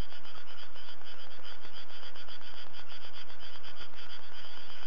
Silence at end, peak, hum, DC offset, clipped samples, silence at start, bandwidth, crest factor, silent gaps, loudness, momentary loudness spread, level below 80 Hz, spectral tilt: 0 s; -18 dBFS; none; 9%; under 0.1%; 0 s; 8 kHz; 18 dB; none; -48 LUFS; 2 LU; -64 dBFS; -4.5 dB/octave